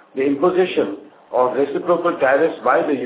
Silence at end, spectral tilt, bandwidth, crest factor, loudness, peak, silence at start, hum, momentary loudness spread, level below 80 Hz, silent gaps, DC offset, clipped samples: 0 s; -9.5 dB/octave; 4 kHz; 16 dB; -18 LUFS; -4 dBFS; 0.15 s; none; 7 LU; -66 dBFS; none; under 0.1%; under 0.1%